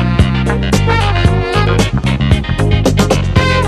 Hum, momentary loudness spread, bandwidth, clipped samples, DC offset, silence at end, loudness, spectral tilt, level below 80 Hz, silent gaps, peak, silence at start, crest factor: none; 2 LU; 14 kHz; 0.1%; under 0.1%; 0 s; -12 LUFS; -6 dB/octave; -18 dBFS; none; 0 dBFS; 0 s; 12 dB